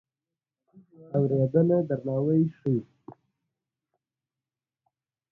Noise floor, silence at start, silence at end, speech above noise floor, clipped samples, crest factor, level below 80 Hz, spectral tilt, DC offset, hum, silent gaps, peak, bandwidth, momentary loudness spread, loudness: under -90 dBFS; 1 s; 2.2 s; over 65 dB; under 0.1%; 18 dB; -66 dBFS; -13 dB/octave; under 0.1%; none; none; -10 dBFS; 3 kHz; 7 LU; -26 LUFS